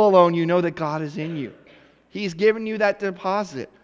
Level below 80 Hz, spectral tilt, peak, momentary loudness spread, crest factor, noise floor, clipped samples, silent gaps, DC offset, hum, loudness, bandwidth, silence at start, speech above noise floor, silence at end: -64 dBFS; -7 dB/octave; -2 dBFS; 14 LU; 20 dB; -52 dBFS; under 0.1%; none; under 0.1%; none; -22 LUFS; 7.8 kHz; 0 s; 31 dB; 0.2 s